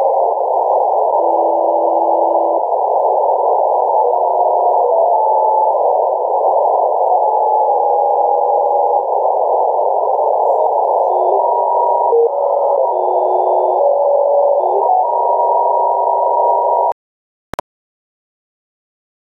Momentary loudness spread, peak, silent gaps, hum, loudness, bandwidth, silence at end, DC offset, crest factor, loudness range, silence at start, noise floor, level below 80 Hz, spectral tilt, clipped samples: 2 LU; -4 dBFS; none; none; -14 LUFS; 4.2 kHz; 2.45 s; under 0.1%; 10 dB; 2 LU; 0 s; under -90 dBFS; -64 dBFS; -7 dB/octave; under 0.1%